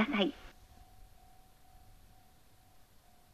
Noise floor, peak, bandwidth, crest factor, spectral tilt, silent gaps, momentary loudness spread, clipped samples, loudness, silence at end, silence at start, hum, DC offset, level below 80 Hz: -62 dBFS; -16 dBFS; 14 kHz; 26 dB; -5.5 dB/octave; none; 30 LU; under 0.1%; -34 LUFS; 2.3 s; 0 s; none; under 0.1%; -62 dBFS